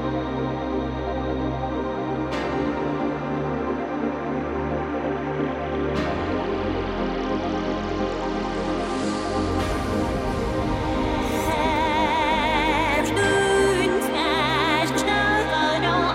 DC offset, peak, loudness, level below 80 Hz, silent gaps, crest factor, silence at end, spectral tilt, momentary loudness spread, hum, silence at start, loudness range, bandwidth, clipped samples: under 0.1%; -8 dBFS; -24 LUFS; -36 dBFS; none; 14 dB; 0 s; -5 dB/octave; 7 LU; none; 0 s; 6 LU; 16 kHz; under 0.1%